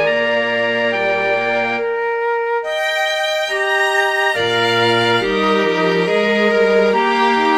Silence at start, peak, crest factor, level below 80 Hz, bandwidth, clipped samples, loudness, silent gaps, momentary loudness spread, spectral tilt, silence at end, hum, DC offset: 0 s; -2 dBFS; 14 dB; -52 dBFS; 15 kHz; under 0.1%; -16 LUFS; none; 5 LU; -4 dB/octave; 0 s; none; under 0.1%